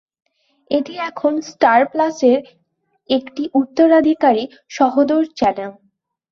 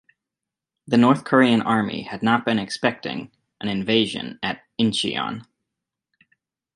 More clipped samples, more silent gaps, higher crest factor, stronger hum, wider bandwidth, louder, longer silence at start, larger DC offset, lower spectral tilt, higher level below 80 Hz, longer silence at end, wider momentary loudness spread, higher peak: neither; neither; second, 16 dB vs 22 dB; neither; second, 7.2 kHz vs 11 kHz; first, -16 LUFS vs -21 LUFS; second, 0.7 s vs 0.9 s; neither; about the same, -5 dB/octave vs -5.5 dB/octave; about the same, -58 dBFS vs -62 dBFS; second, 0.6 s vs 1.35 s; second, 9 LU vs 13 LU; about the same, -2 dBFS vs -2 dBFS